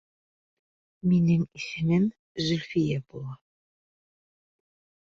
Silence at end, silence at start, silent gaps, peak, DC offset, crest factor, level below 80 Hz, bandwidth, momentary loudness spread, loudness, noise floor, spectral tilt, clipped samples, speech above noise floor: 1.7 s; 1.05 s; 2.19-2.35 s; -14 dBFS; under 0.1%; 16 dB; -60 dBFS; 7.4 kHz; 14 LU; -27 LUFS; under -90 dBFS; -7 dB/octave; under 0.1%; over 64 dB